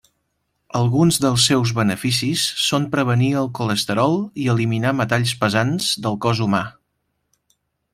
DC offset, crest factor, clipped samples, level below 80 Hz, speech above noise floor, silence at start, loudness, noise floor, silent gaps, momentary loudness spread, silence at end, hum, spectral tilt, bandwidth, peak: under 0.1%; 18 dB; under 0.1%; -54 dBFS; 54 dB; 0.75 s; -19 LUFS; -72 dBFS; none; 5 LU; 1.25 s; none; -4.5 dB/octave; 16 kHz; -2 dBFS